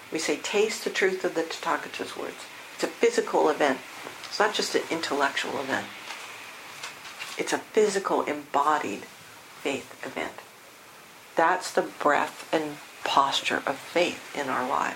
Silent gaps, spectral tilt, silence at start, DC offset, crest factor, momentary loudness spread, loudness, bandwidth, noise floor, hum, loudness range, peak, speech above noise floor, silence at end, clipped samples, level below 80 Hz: none; -2.5 dB/octave; 0 s; under 0.1%; 22 dB; 15 LU; -27 LUFS; 16.5 kHz; -49 dBFS; none; 4 LU; -6 dBFS; 22 dB; 0 s; under 0.1%; -74 dBFS